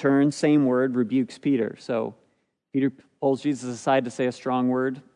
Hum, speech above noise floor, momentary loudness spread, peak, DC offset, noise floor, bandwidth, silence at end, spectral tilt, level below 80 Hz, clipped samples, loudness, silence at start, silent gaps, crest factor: none; 47 dB; 8 LU; -8 dBFS; under 0.1%; -70 dBFS; 10.5 kHz; 0.15 s; -6.5 dB/octave; -78 dBFS; under 0.1%; -24 LUFS; 0 s; none; 16 dB